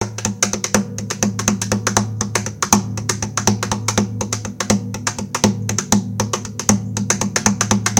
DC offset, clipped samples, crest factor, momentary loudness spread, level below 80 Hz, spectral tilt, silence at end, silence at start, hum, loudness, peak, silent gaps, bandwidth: under 0.1%; under 0.1%; 20 dB; 6 LU; -42 dBFS; -3.5 dB/octave; 0 s; 0 s; none; -19 LUFS; 0 dBFS; none; 17 kHz